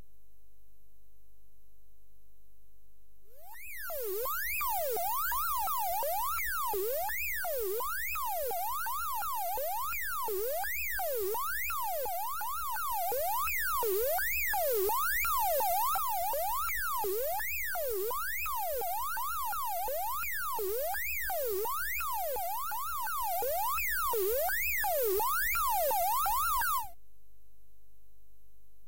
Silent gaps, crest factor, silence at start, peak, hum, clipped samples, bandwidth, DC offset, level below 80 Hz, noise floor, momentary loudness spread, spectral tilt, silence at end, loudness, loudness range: none; 14 dB; 3.4 s; -20 dBFS; none; under 0.1%; 16 kHz; 0.9%; -54 dBFS; -67 dBFS; 5 LU; -1.5 dB/octave; 1.95 s; -32 LUFS; 4 LU